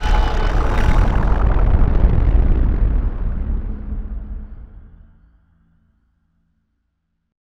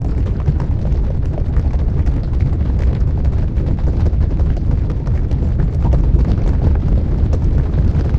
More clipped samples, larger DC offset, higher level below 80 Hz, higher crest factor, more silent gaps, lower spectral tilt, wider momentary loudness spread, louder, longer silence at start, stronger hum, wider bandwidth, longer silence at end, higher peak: neither; neither; about the same, -18 dBFS vs -16 dBFS; about the same, 16 dB vs 12 dB; neither; second, -7.5 dB/octave vs -10 dB/octave; first, 14 LU vs 3 LU; second, -20 LUFS vs -17 LUFS; about the same, 0 s vs 0 s; neither; first, 6.4 kHz vs 5.8 kHz; first, 2.65 s vs 0 s; about the same, 0 dBFS vs -2 dBFS